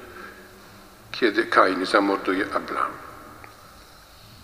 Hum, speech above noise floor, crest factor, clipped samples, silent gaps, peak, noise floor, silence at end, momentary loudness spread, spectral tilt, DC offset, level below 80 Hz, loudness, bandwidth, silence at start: none; 26 dB; 24 dB; under 0.1%; none; -2 dBFS; -48 dBFS; 0.1 s; 25 LU; -4 dB/octave; under 0.1%; -58 dBFS; -22 LUFS; 15.5 kHz; 0 s